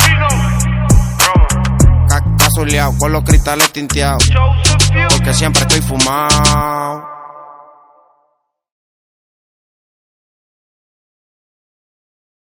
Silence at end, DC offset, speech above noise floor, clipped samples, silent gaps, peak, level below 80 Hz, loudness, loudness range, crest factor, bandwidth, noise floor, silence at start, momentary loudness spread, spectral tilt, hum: 4.95 s; under 0.1%; 52 dB; 0.3%; none; 0 dBFS; -20 dBFS; -11 LUFS; 6 LU; 14 dB; over 20 kHz; -64 dBFS; 0 s; 5 LU; -4 dB/octave; none